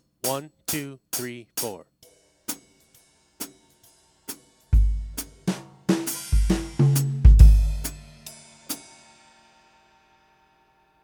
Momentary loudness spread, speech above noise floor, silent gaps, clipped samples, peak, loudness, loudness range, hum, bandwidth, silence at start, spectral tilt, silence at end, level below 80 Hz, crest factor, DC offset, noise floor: 22 LU; 30 dB; none; under 0.1%; 0 dBFS; -24 LUFS; 15 LU; 60 Hz at -50 dBFS; over 20 kHz; 0.25 s; -5.5 dB/octave; 2.25 s; -24 dBFS; 22 dB; under 0.1%; -62 dBFS